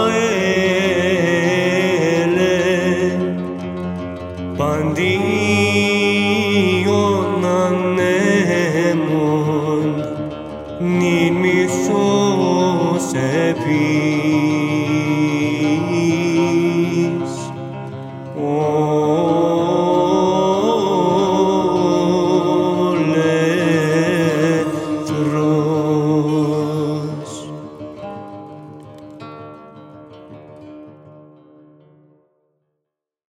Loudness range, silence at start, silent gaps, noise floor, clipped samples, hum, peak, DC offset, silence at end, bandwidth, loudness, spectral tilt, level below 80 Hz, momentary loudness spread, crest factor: 5 LU; 0 s; none; -80 dBFS; under 0.1%; none; -2 dBFS; under 0.1%; 2.15 s; 15.5 kHz; -17 LUFS; -6 dB/octave; -52 dBFS; 14 LU; 16 dB